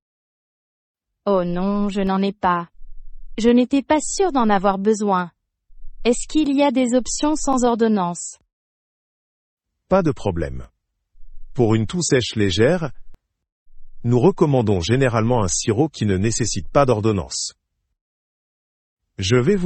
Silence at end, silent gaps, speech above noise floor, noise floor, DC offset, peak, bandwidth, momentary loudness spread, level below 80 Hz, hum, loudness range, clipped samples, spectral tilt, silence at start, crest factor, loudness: 0 s; 8.53-9.57 s, 13.52-13.66 s, 18.01-18.97 s; 27 dB; -45 dBFS; under 0.1%; -2 dBFS; 8.8 kHz; 9 LU; -40 dBFS; none; 4 LU; under 0.1%; -5.5 dB/octave; 1.25 s; 18 dB; -19 LUFS